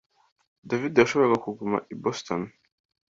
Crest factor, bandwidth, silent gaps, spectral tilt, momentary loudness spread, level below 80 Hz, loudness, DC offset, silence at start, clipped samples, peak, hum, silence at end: 24 dB; 7.8 kHz; none; -5.5 dB/octave; 11 LU; -64 dBFS; -25 LUFS; under 0.1%; 0.65 s; under 0.1%; -4 dBFS; none; 0.65 s